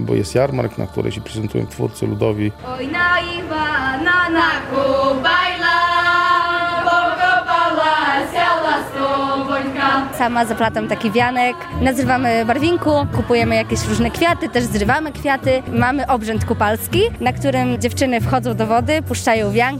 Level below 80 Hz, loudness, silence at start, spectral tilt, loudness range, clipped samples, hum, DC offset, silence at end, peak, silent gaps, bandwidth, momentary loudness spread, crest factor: -40 dBFS; -17 LUFS; 0 s; -5 dB/octave; 3 LU; under 0.1%; none; under 0.1%; 0 s; -2 dBFS; none; 16 kHz; 6 LU; 14 dB